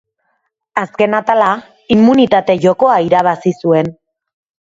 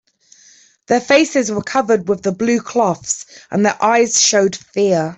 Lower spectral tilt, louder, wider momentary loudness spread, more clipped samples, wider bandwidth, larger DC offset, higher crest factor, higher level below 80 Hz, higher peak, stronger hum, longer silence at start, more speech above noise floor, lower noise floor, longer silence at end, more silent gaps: first, -7 dB/octave vs -3 dB/octave; about the same, -13 LUFS vs -15 LUFS; first, 11 LU vs 8 LU; neither; about the same, 7.8 kHz vs 8.4 kHz; neither; about the same, 14 dB vs 14 dB; first, -52 dBFS vs -58 dBFS; about the same, 0 dBFS vs -2 dBFS; neither; second, 0.75 s vs 0.9 s; first, 55 dB vs 33 dB; first, -66 dBFS vs -49 dBFS; first, 0.75 s vs 0.05 s; neither